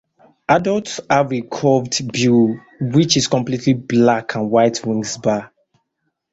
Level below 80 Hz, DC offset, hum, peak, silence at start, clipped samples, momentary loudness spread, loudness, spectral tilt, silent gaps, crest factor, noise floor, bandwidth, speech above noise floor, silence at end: -54 dBFS; under 0.1%; none; -2 dBFS; 0.5 s; under 0.1%; 7 LU; -17 LUFS; -5 dB/octave; none; 16 dB; -73 dBFS; 8 kHz; 57 dB; 0.85 s